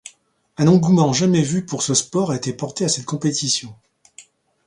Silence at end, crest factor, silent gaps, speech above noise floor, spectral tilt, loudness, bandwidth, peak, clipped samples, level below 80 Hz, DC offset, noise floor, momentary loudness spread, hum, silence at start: 0.45 s; 18 dB; none; 36 dB; -5 dB/octave; -19 LUFS; 11 kHz; -2 dBFS; under 0.1%; -58 dBFS; under 0.1%; -54 dBFS; 8 LU; none; 0.6 s